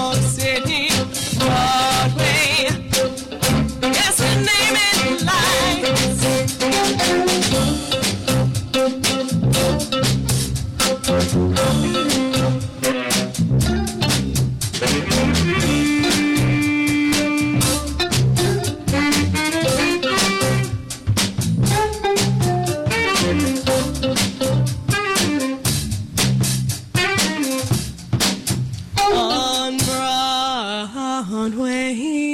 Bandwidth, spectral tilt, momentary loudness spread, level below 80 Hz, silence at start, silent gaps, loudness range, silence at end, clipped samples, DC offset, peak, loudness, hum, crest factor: 16.5 kHz; -4 dB/octave; 6 LU; -36 dBFS; 0 s; none; 3 LU; 0 s; under 0.1%; under 0.1%; -8 dBFS; -18 LUFS; none; 10 dB